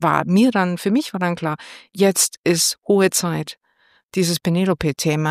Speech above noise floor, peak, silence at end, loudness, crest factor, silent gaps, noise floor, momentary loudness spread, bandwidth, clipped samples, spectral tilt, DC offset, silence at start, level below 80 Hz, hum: 41 dB; -2 dBFS; 0 s; -19 LUFS; 18 dB; 2.38-2.44 s, 4.03-4.09 s; -60 dBFS; 11 LU; 15.5 kHz; under 0.1%; -4.5 dB/octave; under 0.1%; 0 s; -52 dBFS; none